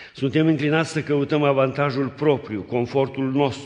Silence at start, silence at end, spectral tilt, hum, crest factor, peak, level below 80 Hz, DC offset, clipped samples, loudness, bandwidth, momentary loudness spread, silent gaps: 0 s; 0 s; -7 dB/octave; none; 16 dB; -4 dBFS; -60 dBFS; under 0.1%; under 0.1%; -22 LUFS; 10 kHz; 4 LU; none